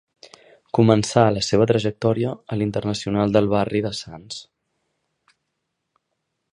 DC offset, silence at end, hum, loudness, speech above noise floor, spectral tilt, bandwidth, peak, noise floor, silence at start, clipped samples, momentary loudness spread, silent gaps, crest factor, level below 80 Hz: under 0.1%; 2.1 s; none; -20 LUFS; 58 dB; -6 dB/octave; 11 kHz; -2 dBFS; -77 dBFS; 0.75 s; under 0.1%; 15 LU; none; 22 dB; -52 dBFS